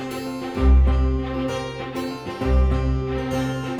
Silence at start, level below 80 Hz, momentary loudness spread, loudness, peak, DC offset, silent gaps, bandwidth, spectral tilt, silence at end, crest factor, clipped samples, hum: 0 s; -22 dBFS; 11 LU; -23 LUFS; -6 dBFS; under 0.1%; none; 12.5 kHz; -7.5 dB/octave; 0 s; 14 dB; under 0.1%; none